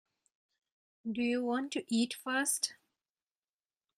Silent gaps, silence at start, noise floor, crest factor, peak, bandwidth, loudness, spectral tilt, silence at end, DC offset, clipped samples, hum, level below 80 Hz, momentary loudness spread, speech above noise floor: none; 1.05 s; under -90 dBFS; 20 dB; -16 dBFS; 15.5 kHz; -34 LUFS; -2 dB/octave; 1.25 s; under 0.1%; under 0.1%; none; -82 dBFS; 6 LU; over 56 dB